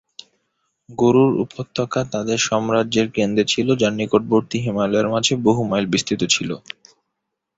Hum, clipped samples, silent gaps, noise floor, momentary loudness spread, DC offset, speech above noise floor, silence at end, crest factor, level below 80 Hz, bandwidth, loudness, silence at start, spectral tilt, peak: none; under 0.1%; none; -78 dBFS; 8 LU; under 0.1%; 59 dB; 1 s; 18 dB; -54 dBFS; 8 kHz; -19 LUFS; 0.9 s; -4.5 dB/octave; -2 dBFS